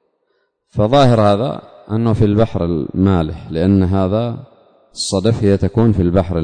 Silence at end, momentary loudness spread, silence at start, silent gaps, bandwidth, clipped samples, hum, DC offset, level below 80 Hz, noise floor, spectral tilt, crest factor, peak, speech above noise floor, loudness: 0 s; 11 LU; 0.75 s; none; 9.6 kHz; under 0.1%; none; under 0.1%; -36 dBFS; -65 dBFS; -7 dB/octave; 14 dB; -2 dBFS; 51 dB; -15 LUFS